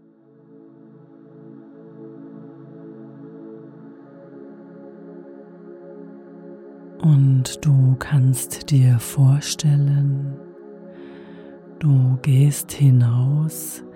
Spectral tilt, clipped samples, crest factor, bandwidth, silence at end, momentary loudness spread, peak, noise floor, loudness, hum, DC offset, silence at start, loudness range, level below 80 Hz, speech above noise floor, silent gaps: -6.5 dB/octave; under 0.1%; 16 dB; 16.5 kHz; 0.05 s; 25 LU; -6 dBFS; -51 dBFS; -18 LUFS; none; under 0.1%; 1.5 s; 23 LU; -56 dBFS; 34 dB; none